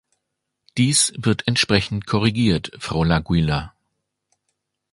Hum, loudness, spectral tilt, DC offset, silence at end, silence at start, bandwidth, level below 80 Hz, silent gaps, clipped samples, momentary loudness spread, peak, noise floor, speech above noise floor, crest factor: none; -20 LUFS; -4 dB/octave; under 0.1%; 1.25 s; 0.75 s; 11.5 kHz; -40 dBFS; none; under 0.1%; 9 LU; 0 dBFS; -78 dBFS; 59 dB; 20 dB